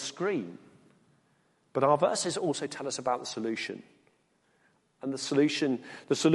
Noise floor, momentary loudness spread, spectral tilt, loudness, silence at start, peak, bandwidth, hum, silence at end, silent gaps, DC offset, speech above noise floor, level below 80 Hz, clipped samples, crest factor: -70 dBFS; 11 LU; -4.5 dB/octave; -30 LUFS; 0 s; -10 dBFS; 11.5 kHz; none; 0 s; none; under 0.1%; 41 dB; -78 dBFS; under 0.1%; 20 dB